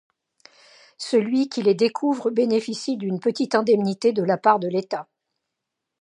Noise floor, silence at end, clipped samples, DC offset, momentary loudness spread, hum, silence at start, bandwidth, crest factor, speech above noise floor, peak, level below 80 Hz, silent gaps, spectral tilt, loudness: -82 dBFS; 1 s; under 0.1%; under 0.1%; 8 LU; none; 1 s; 10.5 kHz; 20 dB; 61 dB; -4 dBFS; -74 dBFS; none; -5.5 dB/octave; -22 LUFS